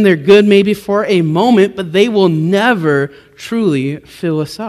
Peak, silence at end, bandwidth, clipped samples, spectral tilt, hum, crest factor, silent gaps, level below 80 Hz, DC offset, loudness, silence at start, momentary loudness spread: 0 dBFS; 0 s; 14 kHz; 0.5%; -6.5 dB/octave; none; 12 dB; none; -54 dBFS; under 0.1%; -12 LUFS; 0 s; 13 LU